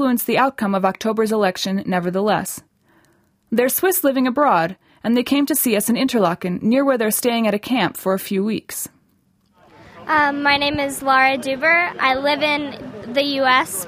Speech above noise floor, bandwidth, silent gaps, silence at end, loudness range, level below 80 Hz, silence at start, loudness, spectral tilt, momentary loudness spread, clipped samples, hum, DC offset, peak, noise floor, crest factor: 42 dB; 16 kHz; none; 0 s; 4 LU; -56 dBFS; 0 s; -18 LUFS; -4 dB/octave; 8 LU; under 0.1%; none; under 0.1%; -2 dBFS; -61 dBFS; 18 dB